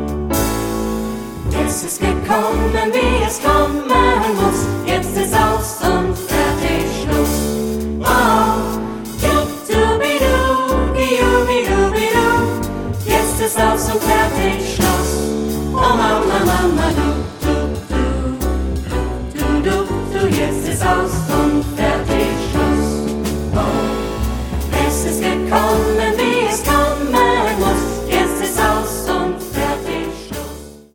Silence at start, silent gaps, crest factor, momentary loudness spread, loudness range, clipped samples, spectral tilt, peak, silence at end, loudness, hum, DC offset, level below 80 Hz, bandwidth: 0 s; none; 14 dB; 7 LU; 3 LU; under 0.1%; -5 dB/octave; -2 dBFS; 0.15 s; -17 LUFS; none; under 0.1%; -26 dBFS; 17.5 kHz